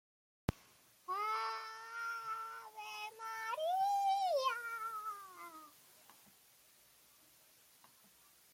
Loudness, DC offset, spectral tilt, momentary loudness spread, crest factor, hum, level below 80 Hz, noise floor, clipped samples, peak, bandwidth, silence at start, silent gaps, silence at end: -40 LUFS; under 0.1%; -3.5 dB/octave; 21 LU; 24 dB; none; -68 dBFS; -67 dBFS; under 0.1%; -18 dBFS; 16.5 kHz; 0.5 s; none; 2.25 s